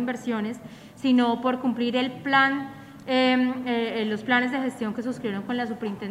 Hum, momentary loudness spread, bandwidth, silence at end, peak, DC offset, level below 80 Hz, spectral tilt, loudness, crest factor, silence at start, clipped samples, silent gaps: none; 11 LU; 11 kHz; 0 s; -6 dBFS; under 0.1%; -66 dBFS; -5.5 dB/octave; -25 LUFS; 18 dB; 0 s; under 0.1%; none